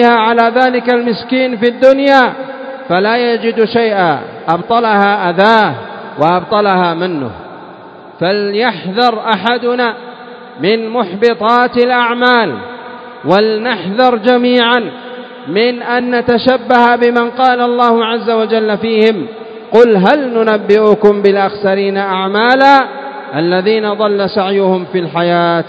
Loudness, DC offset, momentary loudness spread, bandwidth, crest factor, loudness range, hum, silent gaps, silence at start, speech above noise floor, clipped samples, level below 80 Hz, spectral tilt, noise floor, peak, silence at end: -11 LUFS; under 0.1%; 13 LU; 8 kHz; 12 dB; 4 LU; none; none; 0 s; 22 dB; 0.5%; -54 dBFS; -7 dB/octave; -33 dBFS; 0 dBFS; 0 s